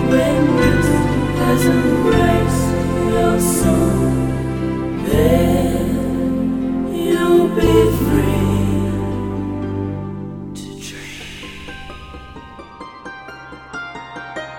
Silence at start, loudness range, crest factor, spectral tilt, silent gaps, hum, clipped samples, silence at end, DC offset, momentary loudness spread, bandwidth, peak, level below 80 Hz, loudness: 0 s; 16 LU; 16 dB; -6.5 dB/octave; none; none; under 0.1%; 0 s; under 0.1%; 19 LU; 17.5 kHz; 0 dBFS; -30 dBFS; -16 LUFS